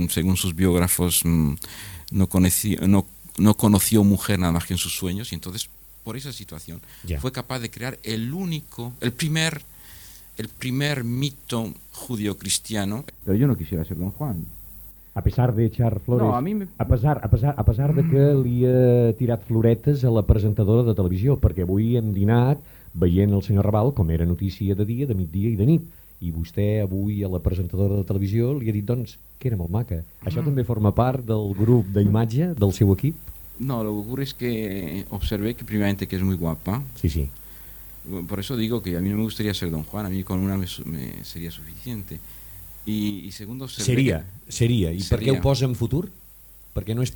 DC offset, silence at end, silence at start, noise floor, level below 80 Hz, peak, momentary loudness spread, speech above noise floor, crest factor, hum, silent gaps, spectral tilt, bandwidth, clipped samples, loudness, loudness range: under 0.1%; 0 s; 0 s; -47 dBFS; -38 dBFS; -2 dBFS; 15 LU; 25 dB; 20 dB; none; none; -6 dB/octave; 19 kHz; under 0.1%; -23 LUFS; 8 LU